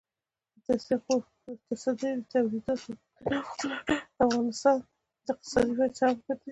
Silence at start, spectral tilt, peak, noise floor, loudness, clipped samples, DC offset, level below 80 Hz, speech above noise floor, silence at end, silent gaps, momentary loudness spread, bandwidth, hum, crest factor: 0.7 s; -4.5 dB/octave; -10 dBFS; under -90 dBFS; -30 LUFS; under 0.1%; under 0.1%; -58 dBFS; over 61 dB; 0 s; none; 11 LU; 10.5 kHz; none; 20 dB